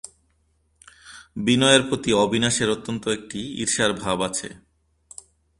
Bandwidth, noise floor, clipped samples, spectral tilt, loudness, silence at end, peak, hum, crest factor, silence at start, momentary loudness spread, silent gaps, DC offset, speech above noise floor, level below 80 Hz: 11.5 kHz; -66 dBFS; under 0.1%; -3.5 dB/octave; -21 LUFS; 1 s; 0 dBFS; none; 24 dB; 1.05 s; 26 LU; none; under 0.1%; 44 dB; -54 dBFS